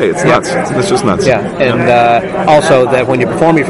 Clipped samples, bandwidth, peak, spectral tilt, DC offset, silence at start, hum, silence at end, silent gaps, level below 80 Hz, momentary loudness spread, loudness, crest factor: 0.3%; 11.5 kHz; 0 dBFS; -5.5 dB/octave; under 0.1%; 0 s; none; 0 s; none; -40 dBFS; 5 LU; -10 LUFS; 10 dB